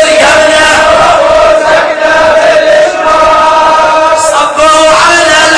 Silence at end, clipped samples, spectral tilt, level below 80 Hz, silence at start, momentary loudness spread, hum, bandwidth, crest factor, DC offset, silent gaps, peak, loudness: 0 s; 7%; -1.5 dB/octave; -32 dBFS; 0 s; 3 LU; none; 11 kHz; 4 dB; under 0.1%; none; 0 dBFS; -4 LUFS